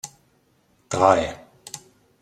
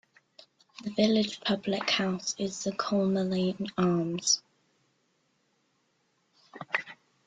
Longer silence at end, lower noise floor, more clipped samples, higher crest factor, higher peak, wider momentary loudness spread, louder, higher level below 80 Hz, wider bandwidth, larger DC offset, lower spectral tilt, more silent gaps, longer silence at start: first, 0.45 s vs 0.3 s; second, -63 dBFS vs -73 dBFS; neither; about the same, 24 dB vs 20 dB; first, -2 dBFS vs -12 dBFS; first, 22 LU vs 7 LU; first, -21 LUFS vs -29 LUFS; first, -54 dBFS vs -70 dBFS; first, 15 kHz vs 9.4 kHz; neither; about the same, -4.5 dB/octave vs -4 dB/octave; neither; second, 0.05 s vs 0.8 s